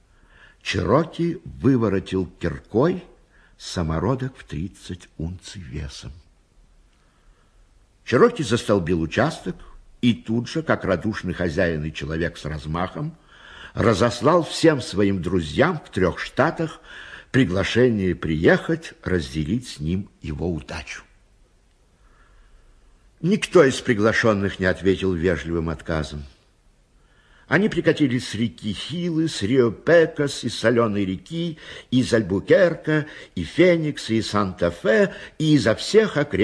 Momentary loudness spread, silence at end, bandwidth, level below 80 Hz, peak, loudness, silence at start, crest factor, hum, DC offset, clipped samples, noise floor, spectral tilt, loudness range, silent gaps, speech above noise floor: 15 LU; 0 s; 11 kHz; -44 dBFS; -2 dBFS; -22 LUFS; 0.65 s; 20 dB; none; under 0.1%; under 0.1%; -58 dBFS; -6 dB/octave; 9 LU; none; 37 dB